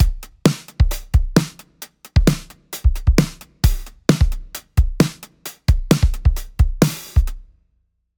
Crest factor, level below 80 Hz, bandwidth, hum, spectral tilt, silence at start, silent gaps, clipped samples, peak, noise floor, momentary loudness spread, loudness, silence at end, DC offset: 18 dB; -22 dBFS; over 20 kHz; none; -6 dB/octave; 0 s; none; under 0.1%; 0 dBFS; -66 dBFS; 14 LU; -20 LUFS; 0.75 s; under 0.1%